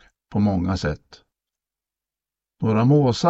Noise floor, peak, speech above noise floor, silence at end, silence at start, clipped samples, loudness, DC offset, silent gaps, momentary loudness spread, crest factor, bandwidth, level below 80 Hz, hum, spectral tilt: -90 dBFS; -4 dBFS; 70 dB; 0 s; 0.3 s; under 0.1%; -21 LUFS; under 0.1%; none; 11 LU; 18 dB; 8 kHz; -46 dBFS; none; -7.5 dB/octave